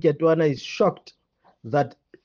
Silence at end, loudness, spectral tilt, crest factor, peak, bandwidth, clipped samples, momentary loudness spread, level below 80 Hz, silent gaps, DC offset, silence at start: 0.35 s; -23 LUFS; -7 dB/octave; 16 dB; -8 dBFS; 7.2 kHz; under 0.1%; 17 LU; -68 dBFS; none; under 0.1%; 0.05 s